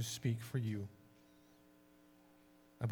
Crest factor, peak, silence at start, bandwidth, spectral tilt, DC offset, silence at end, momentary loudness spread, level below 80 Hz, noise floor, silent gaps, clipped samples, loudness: 20 dB; -24 dBFS; 0 s; 19 kHz; -5.5 dB/octave; under 0.1%; 0 s; 24 LU; -76 dBFS; -66 dBFS; none; under 0.1%; -42 LUFS